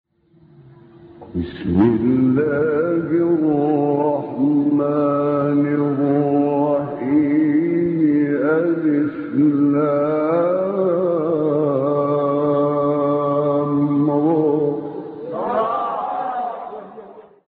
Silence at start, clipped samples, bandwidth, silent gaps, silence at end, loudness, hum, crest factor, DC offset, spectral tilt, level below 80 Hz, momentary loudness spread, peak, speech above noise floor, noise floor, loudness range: 1 s; under 0.1%; 4.3 kHz; none; 0.3 s; -18 LUFS; none; 14 dB; under 0.1%; -8.5 dB/octave; -52 dBFS; 7 LU; -4 dBFS; 35 dB; -52 dBFS; 2 LU